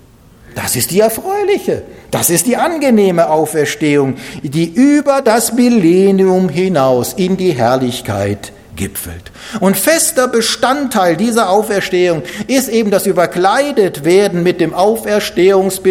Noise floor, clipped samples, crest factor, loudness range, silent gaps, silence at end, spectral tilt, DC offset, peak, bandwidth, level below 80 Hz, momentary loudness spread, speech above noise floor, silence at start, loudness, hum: -41 dBFS; under 0.1%; 12 dB; 3 LU; none; 0 s; -4.5 dB/octave; under 0.1%; 0 dBFS; 17 kHz; -46 dBFS; 10 LU; 29 dB; 0.5 s; -12 LUFS; none